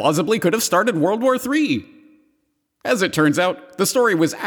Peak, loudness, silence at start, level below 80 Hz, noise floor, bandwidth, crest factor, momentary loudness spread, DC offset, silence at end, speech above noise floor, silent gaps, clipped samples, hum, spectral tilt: -4 dBFS; -18 LUFS; 0 s; -66 dBFS; -69 dBFS; over 20 kHz; 14 dB; 5 LU; under 0.1%; 0 s; 51 dB; none; under 0.1%; none; -4 dB/octave